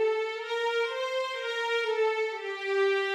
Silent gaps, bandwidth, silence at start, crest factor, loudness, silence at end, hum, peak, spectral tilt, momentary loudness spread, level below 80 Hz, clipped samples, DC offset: none; 12 kHz; 0 s; 12 dB; -29 LUFS; 0 s; none; -16 dBFS; 0.5 dB/octave; 5 LU; under -90 dBFS; under 0.1%; under 0.1%